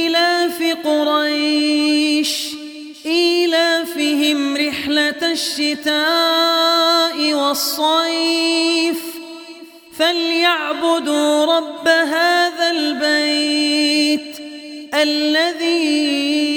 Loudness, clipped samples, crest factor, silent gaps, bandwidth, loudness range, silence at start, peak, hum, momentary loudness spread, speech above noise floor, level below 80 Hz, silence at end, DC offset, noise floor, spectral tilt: -16 LUFS; under 0.1%; 16 dB; none; 19 kHz; 2 LU; 0 s; 0 dBFS; none; 8 LU; 22 dB; -64 dBFS; 0 s; under 0.1%; -38 dBFS; -1 dB/octave